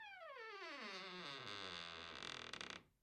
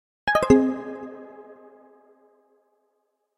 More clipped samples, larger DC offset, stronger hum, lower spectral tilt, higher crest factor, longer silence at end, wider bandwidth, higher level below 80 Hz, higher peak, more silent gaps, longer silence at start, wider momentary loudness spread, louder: neither; neither; neither; second, -2.5 dB/octave vs -6 dB/octave; about the same, 20 dB vs 24 dB; second, 0.15 s vs 1.85 s; about the same, 13 kHz vs 13.5 kHz; second, -82 dBFS vs -50 dBFS; second, -32 dBFS vs -2 dBFS; neither; second, 0 s vs 0.25 s; second, 4 LU vs 24 LU; second, -51 LUFS vs -21 LUFS